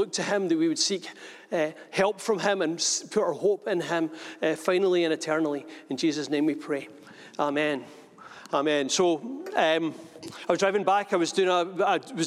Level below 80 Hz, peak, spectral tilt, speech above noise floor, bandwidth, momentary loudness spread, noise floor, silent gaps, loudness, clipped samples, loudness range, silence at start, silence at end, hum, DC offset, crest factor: -78 dBFS; -8 dBFS; -3.5 dB/octave; 21 dB; 13.5 kHz; 10 LU; -47 dBFS; none; -26 LUFS; under 0.1%; 3 LU; 0 s; 0 s; none; under 0.1%; 20 dB